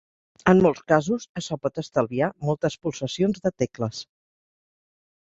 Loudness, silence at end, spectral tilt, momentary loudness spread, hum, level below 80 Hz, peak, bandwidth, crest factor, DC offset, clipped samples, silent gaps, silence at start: -24 LUFS; 1.3 s; -6 dB/octave; 11 LU; none; -56 dBFS; -4 dBFS; 7.8 kHz; 22 dB; under 0.1%; under 0.1%; 1.29-1.35 s; 0.45 s